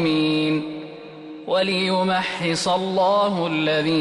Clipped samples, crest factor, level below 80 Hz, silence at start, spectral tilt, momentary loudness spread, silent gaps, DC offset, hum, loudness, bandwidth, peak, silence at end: under 0.1%; 12 dB; -64 dBFS; 0 s; -5 dB/octave; 16 LU; none; under 0.1%; none; -21 LUFS; 11.5 kHz; -10 dBFS; 0 s